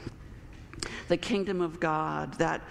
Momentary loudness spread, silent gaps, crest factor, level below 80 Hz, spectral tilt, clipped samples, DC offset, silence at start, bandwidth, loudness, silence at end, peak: 19 LU; none; 20 dB; -50 dBFS; -5.5 dB/octave; under 0.1%; under 0.1%; 0 s; 12.5 kHz; -31 LUFS; 0 s; -12 dBFS